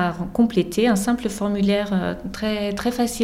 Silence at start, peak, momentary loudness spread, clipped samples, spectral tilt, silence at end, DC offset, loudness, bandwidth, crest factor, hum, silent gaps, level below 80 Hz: 0 s; -6 dBFS; 5 LU; under 0.1%; -5.5 dB/octave; 0 s; under 0.1%; -22 LUFS; 16 kHz; 14 dB; none; none; -44 dBFS